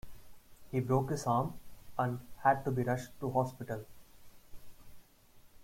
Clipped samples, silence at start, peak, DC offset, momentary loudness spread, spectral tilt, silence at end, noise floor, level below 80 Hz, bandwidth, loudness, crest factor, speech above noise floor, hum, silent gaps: under 0.1%; 0.05 s; -14 dBFS; under 0.1%; 12 LU; -7 dB/octave; 0 s; -60 dBFS; -60 dBFS; 16.5 kHz; -35 LUFS; 22 dB; 27 dB; none; none